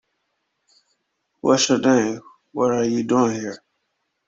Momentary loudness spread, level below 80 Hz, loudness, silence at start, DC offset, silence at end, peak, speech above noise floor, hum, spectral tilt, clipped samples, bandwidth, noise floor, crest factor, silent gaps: 17 LU; -64 dBFS; -20 LUFS; 1.45 s; under 0.1%; 0.7 s; -4 dBFS; 55 dB; none; -4 dB/octave; under 0.1%; 7.8 kHz; -74 dBFS; 20 dB; none